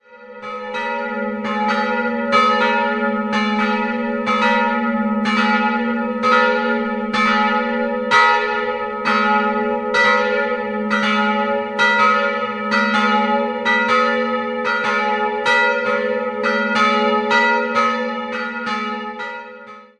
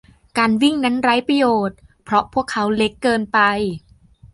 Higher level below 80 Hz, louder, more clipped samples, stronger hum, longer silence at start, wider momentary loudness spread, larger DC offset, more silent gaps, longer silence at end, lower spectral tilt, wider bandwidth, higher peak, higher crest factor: second, -58 dBFS vs -50 dBFS; about the same, -17 LUFS vs -18 LUFS; neither; neither; second, 0.1 s vs 0.35 s; about the same, 9 LU vs 8 LU; neither; neither; about the same, 0.15 s vs 0.1 s; about the same, -4.5 dB/octave vs -5 dB/octave; second, 10 kHz vs 11.5 kHz; about the same, 0 dBFS vs -2 dBFS; about the same, 18 dB vs 16 dB